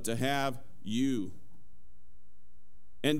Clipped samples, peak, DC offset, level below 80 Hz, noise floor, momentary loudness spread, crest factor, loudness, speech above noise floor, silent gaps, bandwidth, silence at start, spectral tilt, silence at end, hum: under 0.1%; -14 dBFS; 2%; -64 dBFS; -65 dBFS; 11 LU; 20 dB; -34 LUFS; 33 dB; none; 16 kHz; 0 s; -5 dB/octave; 0 s; none